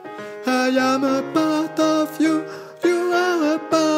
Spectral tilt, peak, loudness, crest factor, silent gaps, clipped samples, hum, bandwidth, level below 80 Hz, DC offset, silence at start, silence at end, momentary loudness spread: -4 dB/octave; -4 dBFS; -20 LUFS; 16 dB; none; under 0.1%; none; 16 kHz; -74 dBFS; under 0.1%; 0 s; 0 s; 6 LU